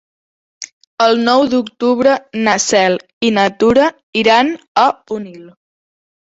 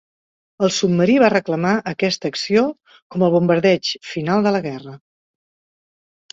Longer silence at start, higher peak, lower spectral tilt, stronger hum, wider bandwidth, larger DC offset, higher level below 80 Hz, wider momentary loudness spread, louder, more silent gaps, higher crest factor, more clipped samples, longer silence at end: about the same, 0.6 s vs 0.6 s; about the same, 0 dBFS vs -2 dBFS; second, -3.5 dB/octave vs -5.5 dB/octave; neither; about the same, 8 kHz vs 7.8 kHz; neither; first, -52 dBFS vs -60 dBFS; first, 14 LU vs 9 LU; first, -13 LUFS vs -18 LUFS; first, 0.72-0.81 s, 0.87-0.97 s, 3.13-3.21 s, 4.03-4.13 s, 4.68-4.75 s vs 3.02-3.10 s; about the same, 14 dB vs 18 dB; neither; second, 0.8 s vs 1.35 s